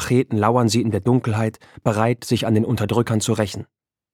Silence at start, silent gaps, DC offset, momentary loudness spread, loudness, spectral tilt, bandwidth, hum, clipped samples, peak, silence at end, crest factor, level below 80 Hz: 0 s; none; under 0.1%; 7 LU; -20 LUFS; -6 dB/octave; 16 kHz; none; under 0.1%; -2 dBFS; 0.5 s; 18 dB; -52 dBFS